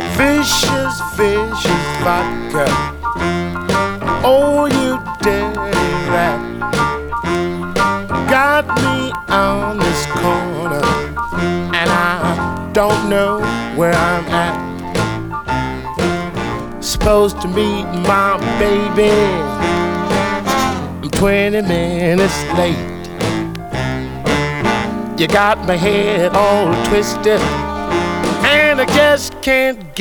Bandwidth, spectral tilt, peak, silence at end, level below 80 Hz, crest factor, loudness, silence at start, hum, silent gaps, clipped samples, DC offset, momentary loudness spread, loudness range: over 20 kHz; -5 dB/octave; 0 dBFS; 0 s; -32 dBFS; 14 dB; -15 LUFS; 0 s; none; none; under 0.1%; under 0.1%; 8 LU; 3 LU